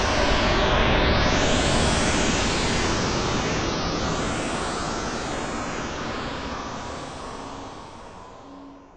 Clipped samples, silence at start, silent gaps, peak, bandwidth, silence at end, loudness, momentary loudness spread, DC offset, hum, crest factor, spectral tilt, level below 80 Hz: under 0.1%; 0 s; none; -8 dBFS; 10.5 kHz; 0.1 s; -24 LUFS; 19 LU; under 0.1%; none; 16 dB; -4 dB/octave; -32 dBFS